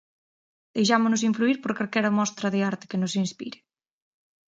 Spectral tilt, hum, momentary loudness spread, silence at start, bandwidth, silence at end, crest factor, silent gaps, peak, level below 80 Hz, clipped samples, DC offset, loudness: -4.5 dB/octave; none; 10 LU; 0.75 s; 9.2 kHz; 1 s; 22 dB; none; -6 dBFS; -72 dBFS; under 0.1%; under 0.1%; -25 LUFS